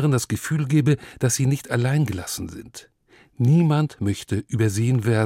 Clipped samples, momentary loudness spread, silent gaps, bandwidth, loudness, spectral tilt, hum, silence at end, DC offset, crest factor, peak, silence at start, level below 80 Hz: under 0.1%; 12 LU; none; 16.5 kHz; -22 LUFS; -6 dB/octave; none; 0 s; under 0.1%; 16 dB; -6 dBFS; 0 s; -56 dBFS